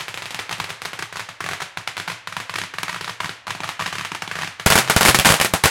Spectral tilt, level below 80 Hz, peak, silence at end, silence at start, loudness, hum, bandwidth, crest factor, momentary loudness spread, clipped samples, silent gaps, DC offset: -2 dB/octave; -42 dBFS; 0 dBFS; 0 s; 0 s; -20 LUFS; none; 17.5 kHz; 22 dB; 17 LU; under 0.1%; none; under 0.1%